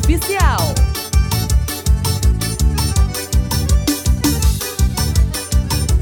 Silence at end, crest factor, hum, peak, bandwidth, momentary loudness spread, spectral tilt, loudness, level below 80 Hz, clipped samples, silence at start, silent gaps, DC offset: 0 s; 14 dB; none; -2 dBFS; over 20 kHz; 3 LU; -4.5 dB/octave; -17 LUFS; -18 dBFS; under 0.1%; 0 s; none; under 0.1%